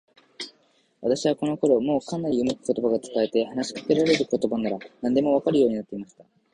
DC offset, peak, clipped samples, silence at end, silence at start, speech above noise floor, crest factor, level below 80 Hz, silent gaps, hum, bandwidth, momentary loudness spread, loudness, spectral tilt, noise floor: under 0.1%; -6 dBFS; under 0.1%; 0.3 s; 0.4 s; 40 dB; 18 dB; -62 dBFS; none; none; 10.5 kHz; 16 LU; -24 LUFS; -5.5 dB/octave; -64 dBFS